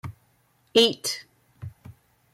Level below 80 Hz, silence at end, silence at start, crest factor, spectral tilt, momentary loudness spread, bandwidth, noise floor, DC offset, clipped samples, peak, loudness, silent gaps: -64 dBFS; 0.45 s; 0.05 s; 22 dB; -3 dB/octave; 24 LU; 16 kHz; -65 dBFS; under 0.1%; under 0.1%; -6 dBFS; -23 LUFS; none